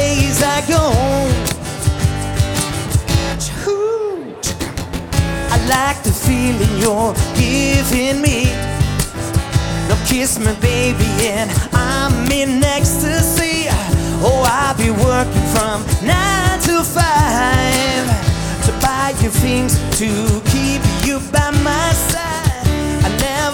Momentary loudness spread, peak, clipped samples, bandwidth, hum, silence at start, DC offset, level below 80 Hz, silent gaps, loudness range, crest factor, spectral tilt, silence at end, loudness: 5 LU; 0 dBFS; under 0.1%; 19.5 kHz; none; 0 s; under 0.1%; -26 dBFS; none; 3 LU; 14 dB; -4.5 dB/octave; 0 s; -15 LUFS